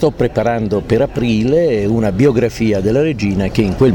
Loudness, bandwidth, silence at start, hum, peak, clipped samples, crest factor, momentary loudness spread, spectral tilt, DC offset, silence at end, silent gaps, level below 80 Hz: -15 LUFS; 18 kHz; 0 s; none; -2 dBFS; under 0.1%; 10 dB; 3 LU; -7.5 dB/octave; under 0.1%; 0 s; none; -32 dBFS